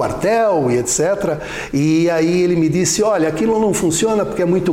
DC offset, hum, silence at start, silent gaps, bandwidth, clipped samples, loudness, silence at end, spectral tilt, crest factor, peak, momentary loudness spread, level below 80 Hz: under 0.1%; none; 0 s; none; 16.5 kHz; under 0.1%; -16 LUFS; 0 s; -5 dB/octave; 8 dB; -6 dBFS; 4 LU; -42 dBFS